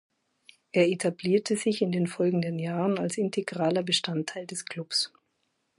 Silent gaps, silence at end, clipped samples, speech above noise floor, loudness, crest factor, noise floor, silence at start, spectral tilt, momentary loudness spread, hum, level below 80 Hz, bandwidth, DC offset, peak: none; 0.7 s; under 0.1%; 49 dB; -28 LUFS; 18 dB; -76 dBFS; 0.75 s; -5 dB/octave; 8 LU; none; -74 dBFS; 11.5 kHz; under 0.1%; -10 dBFS